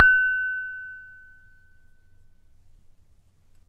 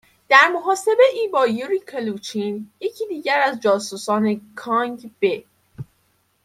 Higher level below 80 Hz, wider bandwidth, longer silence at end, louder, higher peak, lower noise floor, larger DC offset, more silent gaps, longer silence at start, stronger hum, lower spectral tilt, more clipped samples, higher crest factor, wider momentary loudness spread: first, -54 dBFS vs -68 dBFS; second, 5.4 kHz vs 15.5 kHz; first, 2.6 s vs 0.6 s; second, -23 LUFS vs -20 LUFS; about the same, 0 dBFS vs 0 dBFS; second, -58 dBFS vs -64 dBFS; neither; neither; second, 0 s vs 0.3 s; neither; about the same, -3 dB/octave vs -4 dB/octave; neither; first, 26 dB vs 20 dB; first, 25 LU vs 14 LU